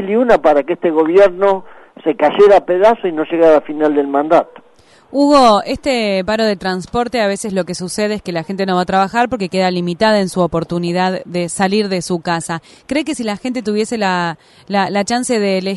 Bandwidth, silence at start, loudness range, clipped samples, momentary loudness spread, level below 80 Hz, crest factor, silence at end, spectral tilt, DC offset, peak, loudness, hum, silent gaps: 11.5 kHz; 0 s; 6 LU; under 0.1%; 10 LU; -46 dBFS; 14 dB; 0 s; -5 dB/octave; under 0.1%; -2 dBFS; -15 LUFS; none; none